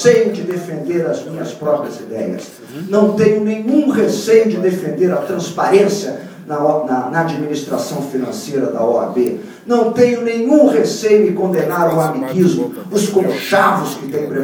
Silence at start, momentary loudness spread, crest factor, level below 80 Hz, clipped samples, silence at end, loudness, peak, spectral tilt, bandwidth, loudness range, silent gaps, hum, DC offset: 0 s; 10 LU; 14 dB; -62 dBFS; under 0.1%; 0 s; -15 LUFS; 0 dBFS; -6 dB/octave; 19.5 kHz; 4 LU; none; none; under 0.1%